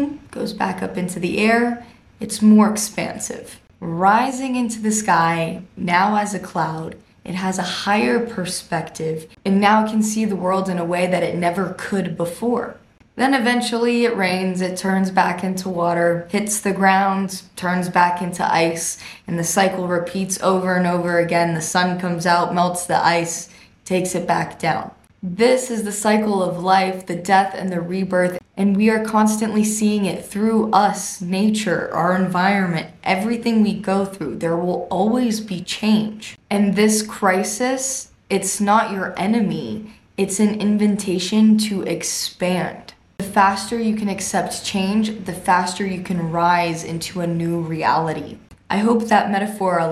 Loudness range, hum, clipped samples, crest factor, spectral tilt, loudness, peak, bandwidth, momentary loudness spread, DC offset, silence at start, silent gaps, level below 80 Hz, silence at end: 2 LU; none; under 0.1%; 18 dB; -4.5 dB/octave; -19 LUFS; 0 dBFS; 14.5 kHz; 10 LU; under 0.1%; 0 s; none; -56 dBFS; 0 s